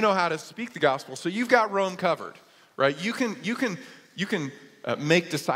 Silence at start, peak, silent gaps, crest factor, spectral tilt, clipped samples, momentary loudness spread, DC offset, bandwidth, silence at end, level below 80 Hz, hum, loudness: 0 s; -4 dBFS; none; 22 dB; -4.5 dB/octave; under 0.1%; 15 LU; under 0.1%; 16 kHz; 0 s; -74 dBFS; none; -26 LUFS